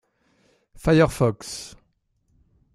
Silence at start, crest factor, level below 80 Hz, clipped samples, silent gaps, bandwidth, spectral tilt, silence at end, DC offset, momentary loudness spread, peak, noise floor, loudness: 0.85 s; 22 dB; -46 dBFS; under 0.1%; none; 14.5 kHz; -6 dB/octave; 1.05 s; under 0.1%; 17 LU; -4 dBFS; -68 dBFS; -22 LUFS